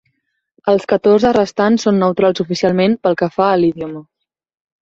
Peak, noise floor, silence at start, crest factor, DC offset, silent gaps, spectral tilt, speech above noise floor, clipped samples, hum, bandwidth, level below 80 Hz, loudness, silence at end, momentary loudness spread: 0 dBFS; -69 dBFS; 0.65 s; 14 dB; under 0.1%; none; -6.5 dB/octave; 56 dB; under 0.1%; none; 7.8 kHz; -52 dBFS; -14 LUFS; 0.85 s; 8 LU